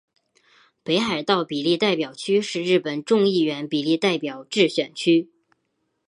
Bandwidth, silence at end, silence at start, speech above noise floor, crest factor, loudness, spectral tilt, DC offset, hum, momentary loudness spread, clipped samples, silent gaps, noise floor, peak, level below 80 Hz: 11 kHz; 0.8 s; 0.85 s; 52 dB; 20 dB; -22 LUFS; -5 dB/octave; under 0.1%; none; 5 LU; under 0.1%; none; -73 dBFS; -4 dBFS; -70 dBFS